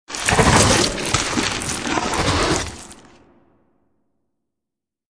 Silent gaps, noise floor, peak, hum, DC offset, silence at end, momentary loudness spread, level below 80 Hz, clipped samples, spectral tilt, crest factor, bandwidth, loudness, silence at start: none; -85 dBFS; 0 dBFS; none; 0.2%; 2.15 s; 10 LU; -34 dBFS; under 0.1%; -3 dB/octave; 20 dB; 14 kHz; -18 LUFS; 0.1 s